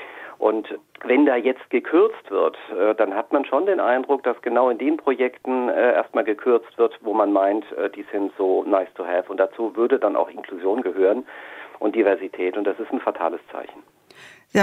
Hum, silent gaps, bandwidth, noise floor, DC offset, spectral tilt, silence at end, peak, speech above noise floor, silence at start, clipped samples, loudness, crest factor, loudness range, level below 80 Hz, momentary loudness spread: none; none; 8 kHz; -48 dBFS; under 0.1%; -6 dB/octave; 0 s; -4 dBFS; 26 dB; 0 s; under 0.1%; -22 LUFS; 16 dB; 3 LU; -74 dBFS; 9 LU